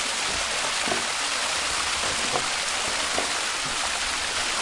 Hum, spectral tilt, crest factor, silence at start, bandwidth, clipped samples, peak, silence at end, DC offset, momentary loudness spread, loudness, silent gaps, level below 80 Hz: none; 0 dB/octave; 18 dB; 0 s; 11.5 kHz; under 0.1%; -8 dBFS; 0 s; under 0.1%; 1 LU; -24 LUFS; none; -50 dBFS